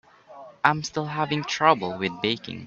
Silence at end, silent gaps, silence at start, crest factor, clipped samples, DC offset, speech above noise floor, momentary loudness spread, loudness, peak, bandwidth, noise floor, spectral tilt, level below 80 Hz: 0 s; none; 0.3 s; 24 dB; under 0.1%; under 0.1%; 22 dB; 7 LU; -24 LUFS; -2 dBFS; 7.8 kHz; -46 dBFS; -4.5 dB/octave; -64 dBFS